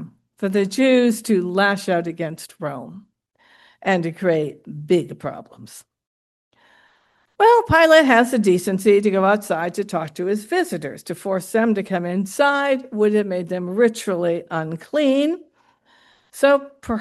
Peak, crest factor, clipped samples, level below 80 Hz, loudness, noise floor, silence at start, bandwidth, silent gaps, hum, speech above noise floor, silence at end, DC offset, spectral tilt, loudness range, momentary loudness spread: -2 dBFS; 18 dB; under 0.1%; -56 dBFS; -19 LUFS; -62 dBFS; 0 s; 12.5 kHz; 6.07-6.51 s; none; 43 dB; 0 s; under 0.1%; -5.5 dB/octave; 8 LU; 15 LU